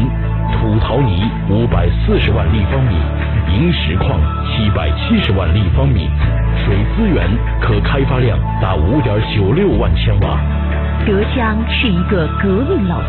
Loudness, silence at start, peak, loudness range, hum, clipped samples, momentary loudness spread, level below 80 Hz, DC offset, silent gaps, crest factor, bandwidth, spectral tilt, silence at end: -15 LUFS; 0 s; -2 dBFS; 0 LU; none; under 0.1%; 3 LU; -18 dBFS; 0.4%; none; 10 dB; 4.4 kHz; -6 dB/octave; 0 s